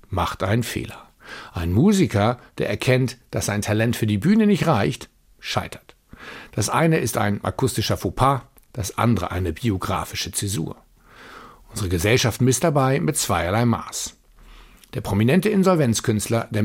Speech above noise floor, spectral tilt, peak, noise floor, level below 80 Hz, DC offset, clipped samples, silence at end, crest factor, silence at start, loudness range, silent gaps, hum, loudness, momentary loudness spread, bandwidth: 26 dB; -5.5 dB/octave; -4 dBFS; -47 dBFS; -44 dBFS; under 0.1%; under 0.1%; 0 s; 18 dB; 0.1 s; 3 LU; none; none; -21 LUFS; 16 LU; 16.5 kHz